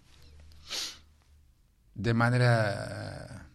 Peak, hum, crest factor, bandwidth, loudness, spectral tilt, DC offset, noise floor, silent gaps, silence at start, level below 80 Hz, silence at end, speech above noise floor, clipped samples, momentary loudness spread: -12 dBFS; none; 20 dB; 12.5 kHz; -29 LUFS; -5.5 dB/octave; under 0.1%; -63 dBFS; none; 0.25 s; -56 dBFS; 0.1 s; 37 dB; under 0.1%; 17 LU